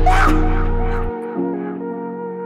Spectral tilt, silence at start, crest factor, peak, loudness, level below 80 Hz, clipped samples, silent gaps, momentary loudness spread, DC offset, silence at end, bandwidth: -7 dB/octave; 0 s; 14 dB; -2 dBFS; -21 LUFS; -20 dBFS; under 0.1%; none; 11 LU; under 0.1%; 0 s; 10 kHz